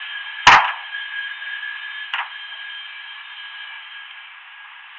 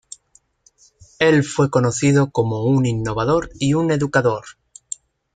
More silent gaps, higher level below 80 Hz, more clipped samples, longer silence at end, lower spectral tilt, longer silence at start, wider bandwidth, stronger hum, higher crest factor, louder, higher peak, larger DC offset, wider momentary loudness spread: neither; about the same, -52 dBFS vs -48 dBFS; neither; second, 0 s vs 0.85 s; second, -0.5 dB/octave vs -6 dB/octave; second, 0 s vs 1.2 s; second, 7.6 kHz vs 9.4 kHz; neither; about the same, 22 dB vs 18 dB; about the same, -19 LUFS vs -18 LUFS; about the same, 0 dBFS vs -2 dBFS; neither; first, 25 LU vs 13 LU